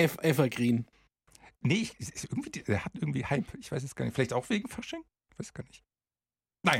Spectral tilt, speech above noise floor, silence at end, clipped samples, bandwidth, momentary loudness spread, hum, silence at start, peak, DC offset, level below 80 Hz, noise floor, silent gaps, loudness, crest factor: -5.5 dB/octave; over 59 dB; 0 s; under 0.1%; 16.5 kHz; 16 LU; none; 0 s; -10 dBFS; under 0.1%; -60 dBFS; under -90 dBFS; none; -32 LUFS; 22 dB